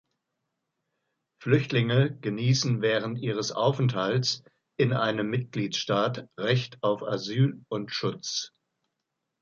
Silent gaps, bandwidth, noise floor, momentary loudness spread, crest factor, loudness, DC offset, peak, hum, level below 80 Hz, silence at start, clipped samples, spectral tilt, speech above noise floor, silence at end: none; 7.4 kHz; -83 dBFS; 8 LU; 20 dB; -27 LUFS; under 0.1%; -8 dBFS; none; -66 dBFS; 1.4 s; under 0.1%; -5.5 dB/octave; 56 dB; 0.95 s